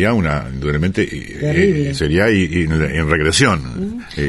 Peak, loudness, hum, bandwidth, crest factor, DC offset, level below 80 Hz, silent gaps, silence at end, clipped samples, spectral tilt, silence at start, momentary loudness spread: 0 dBFS; -16 LUFS; none; 11.5 kHz; 16 dB; under 0.1%; -30 dBFS; none; 0 s; under 0.1%; -5.5 dB/octave; 0 s; 8 LU